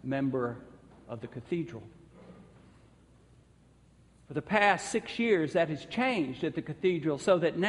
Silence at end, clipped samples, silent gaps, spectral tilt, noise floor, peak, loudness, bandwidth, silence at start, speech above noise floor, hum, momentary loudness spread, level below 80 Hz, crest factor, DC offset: 0 s; under 0.1%; none; -5.5 dB/octave; -61 dBFS; -10 dBFS; -30 LUFS; 11.5 kHz; 0.05 s; 31 dB; none; 16 LU; -64 dBFS; 22 dB; under 0.1%